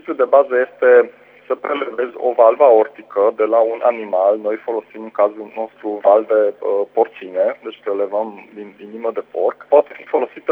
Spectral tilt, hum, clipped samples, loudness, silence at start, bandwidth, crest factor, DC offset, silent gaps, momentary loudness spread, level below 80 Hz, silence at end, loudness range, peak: -7 dB/octave; 50 Hz at -70 dBFS; under 0.1%; -17 LUFS; 0.05 s; 3.9 kHz; 16 dB; under 0.1%; none; 14 LU; -76 dBFS; 0 s; 5 LU; 0 dBFS